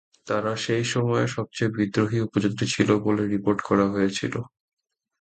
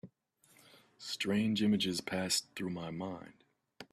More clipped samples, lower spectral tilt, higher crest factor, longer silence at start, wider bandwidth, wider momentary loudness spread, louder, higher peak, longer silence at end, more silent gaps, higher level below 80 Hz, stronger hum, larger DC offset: neither; first, -5.5 dB/octave vs -4 dB/octave; about the same, 20 dB vs 18 dB; first, 0.25 s vs 0.05 s; second, 9.2 kHz vs 14.5 kHz; second, 7 LU vs 15 LU; first, -24 LUFS vs -35 LUFS; first, -6 dBFS vs -18 dBFS; first, 0.75 s vs 0.1 s; neither; first, -56 dBFS vs -72 dBFS; neither; neither